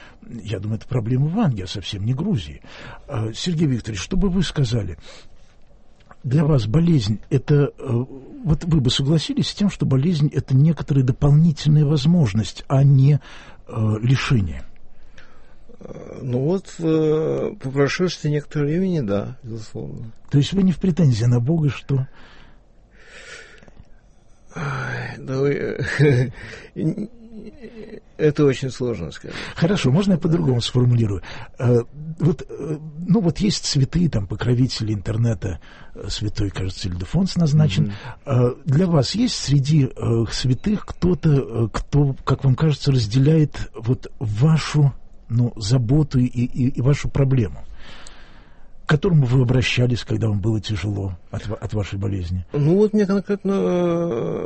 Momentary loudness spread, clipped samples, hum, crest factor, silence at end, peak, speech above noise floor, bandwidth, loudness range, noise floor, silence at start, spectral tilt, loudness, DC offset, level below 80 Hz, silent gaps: 15 LU; under 0.1%; none; 14 dB; 0 s; -6 dBFS; 29 dB; 8.8 kHz; 6 LU; -48 dBFS; 0 s; -7 dB/octave; -20 LUFS; under 0.1%; -38 dBFS; none